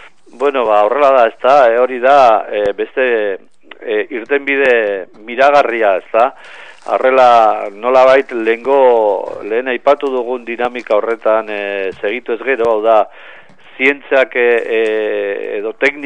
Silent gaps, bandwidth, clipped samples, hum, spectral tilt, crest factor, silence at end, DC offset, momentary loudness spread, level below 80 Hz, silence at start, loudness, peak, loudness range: none; 9.4 kHz; under 0.1%; none; -4.5 dB/octave; 14 dB; 0 s; 0.9%; 10 LU; -60 dBFS; 0.4 s; -13 LUFS; 0 dBFS; 4 LU